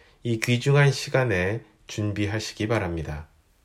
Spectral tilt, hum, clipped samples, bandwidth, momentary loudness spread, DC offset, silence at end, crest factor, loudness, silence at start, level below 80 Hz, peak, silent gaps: -5.5 dB/octave; none; under 0.1%; 14 kHz; 15 LU; under 0.1%; 0.4 s; 18 dB; -25 LUFS; 0.25 s; -48 dBFS; -8 dBFS; none